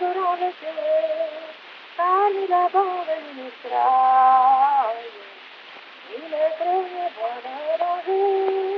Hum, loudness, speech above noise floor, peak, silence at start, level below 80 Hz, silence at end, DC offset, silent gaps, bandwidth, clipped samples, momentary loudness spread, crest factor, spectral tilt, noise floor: none; -21 LUFS; 22 dB; -6 dBFS; 0 s; under -90 dBFS; 0 s; under 0.1%; none; 5.8 kHz; under 0.1%; 22 LU; 16 dB; 1 dB/octave; -42 dBFS